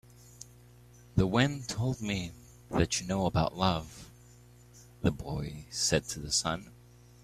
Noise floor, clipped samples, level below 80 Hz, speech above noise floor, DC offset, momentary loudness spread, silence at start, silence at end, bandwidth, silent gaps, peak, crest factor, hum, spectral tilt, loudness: -56 dBFS; under 0.1%; -50 dBFS; 25 dB; under 0.1%; 18 LU; 0.3 s; 0.5 s; 15 kHz; none; -10 dBFS; 22 dB; 60 Hz at -50 dBFS; -4.5 dB/octave; -31 LUFS